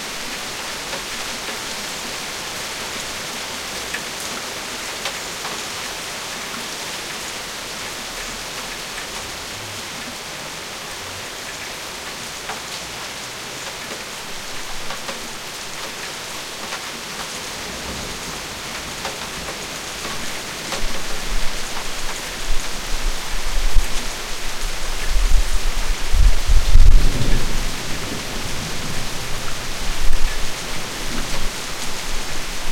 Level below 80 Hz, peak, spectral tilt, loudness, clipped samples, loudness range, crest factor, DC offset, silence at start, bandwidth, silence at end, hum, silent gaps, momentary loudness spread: -22 dBFS; 0 dBFS; -2.5 dB/octave; -25 LUFS; under 0.1%; 7 LU; 18 dB; under 0.1%; 0 s; 16.5 kHz; 0 s; none; none; 5 LU